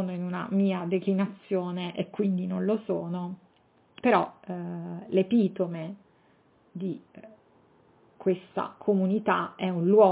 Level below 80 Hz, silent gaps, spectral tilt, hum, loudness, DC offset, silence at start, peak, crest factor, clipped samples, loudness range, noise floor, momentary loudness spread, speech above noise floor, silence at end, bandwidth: -74 dBFS; none; -6.5 dB/octave; none; -28 LUFS; under 0.1%; 0 s; -8 dBFS; 20 dB; under 0.1%; 4 LU; -64 dBFS; 13 LU; 37 dB; 0 s; 4 kHz